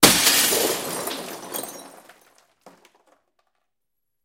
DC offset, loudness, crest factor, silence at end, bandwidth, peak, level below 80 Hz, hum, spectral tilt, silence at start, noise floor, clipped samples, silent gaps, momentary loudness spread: under 0.1%; -20 LUFS; 24 dB; 2.35 s; 17 kHz; 0 dBFS; -56 dBFS; none; -1 dB/octave; 0 s; -83 dBFS; under 0.1%; none; 19 LU